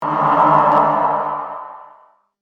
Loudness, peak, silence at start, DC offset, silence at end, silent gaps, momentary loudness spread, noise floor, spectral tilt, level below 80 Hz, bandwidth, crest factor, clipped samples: -15 LUFS; 0 dBFS; 0 s; under 0.1%; 0.6 s; none; 18 LU; -50 dBFS; -8 dB/octave; -58 dBFS; 6.6 kHz; 16 dB; under 0.1%